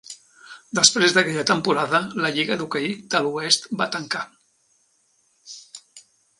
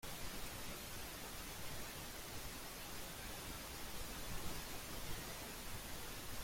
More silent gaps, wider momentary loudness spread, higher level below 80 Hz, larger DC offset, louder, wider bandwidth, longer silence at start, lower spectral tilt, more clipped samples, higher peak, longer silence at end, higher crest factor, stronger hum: neither; first, 24 LU vs 2 LU; second, -68 dBFS vs -56 dBFS; neither; first, -20 LUFS vs -48 LUFS; second, 11.5 kHz vs 16.5 kHz; about the same, 0.1 s vs 0 s; about the same, -2 dB/octave vs -2.5 dB/octave; neither; first, 0 dBFS vs -32 dBFS; first, 0.4 s vs 0 s; first, 24 dB vs 16 dB; neither